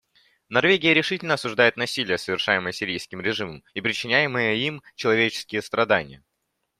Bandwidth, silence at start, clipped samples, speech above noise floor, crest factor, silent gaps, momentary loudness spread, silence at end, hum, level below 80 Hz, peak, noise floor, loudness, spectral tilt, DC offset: 14.5 kHz; 0.5 s; under 0.1%; 53 dB; 22 dB; none; 9 LU; 0.65 s; none; -64 dBFS; -4 dBFS; -77 dBFS; -22 LUFS; -4 dB/octave; under 0.1%